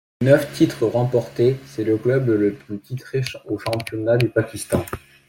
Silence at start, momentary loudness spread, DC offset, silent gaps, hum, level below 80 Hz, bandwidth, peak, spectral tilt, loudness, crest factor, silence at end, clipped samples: 0.2 s; 10 LU; under 0.1%; none; none; -52 dBFS; 17 kHz; -2 dBFS; -6.5 dB/octave; -21 LUFS; 18 dB; 0.3 s; under 0.1%